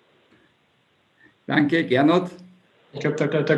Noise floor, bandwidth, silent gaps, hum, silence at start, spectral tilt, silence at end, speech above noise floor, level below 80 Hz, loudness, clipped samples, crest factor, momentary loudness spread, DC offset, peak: -64 dBFS; 8.8 kHz; none; none; 1.5 s; -7 dB/octave; 0 s; 44 dB; -72 dBFS; -21 LUFS; under 0.1%; 20 dB; 19 LU; under 0.1%; -4 dBFS